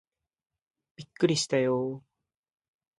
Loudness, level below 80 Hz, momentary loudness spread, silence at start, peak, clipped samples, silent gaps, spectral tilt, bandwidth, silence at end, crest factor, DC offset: -28 LUFS; -74 dBFS; 18 LU; 1 s; -12 dBFS; under 0.1%; none; -4.5 dB/octave; 11.5 kHz; 1 s; 20 dB; under 0.1%